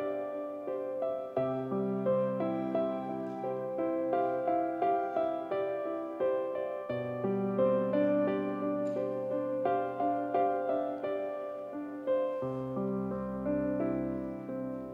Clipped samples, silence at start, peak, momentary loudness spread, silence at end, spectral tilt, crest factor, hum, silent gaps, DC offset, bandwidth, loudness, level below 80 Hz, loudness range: under 0.1%; 0 s; -18 dBFS; 7 LU; 0 s; -9.5 dB/octave; 16 dB; none; none; under 0.1%; 5 kHz; -33 LUFS; -66 dBFS; 3 LU